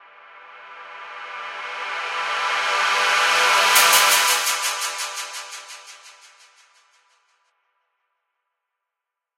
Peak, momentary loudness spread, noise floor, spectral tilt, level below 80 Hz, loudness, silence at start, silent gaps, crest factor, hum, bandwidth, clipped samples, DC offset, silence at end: -2 dBFS; 24 LU; -85 dBFS; 3 dB/octave; -74 dBFS; -18 LUFS; 0.35 s; none; 22 dB; none; 16 kHz; under 0.1%; under 0.1%; 3.25 s